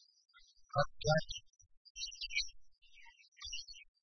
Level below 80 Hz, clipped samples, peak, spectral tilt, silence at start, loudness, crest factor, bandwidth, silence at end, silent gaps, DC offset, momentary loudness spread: -58 dBFS; under 0.1%; -18 dBFS; -3 dB/octave; 0.35 s; -39 LUFS; 24 dB; 6.2 kHz; 0.2 s; 1.77-1.95 s, 3.28-3.32 s; under 0.1%; 21 LU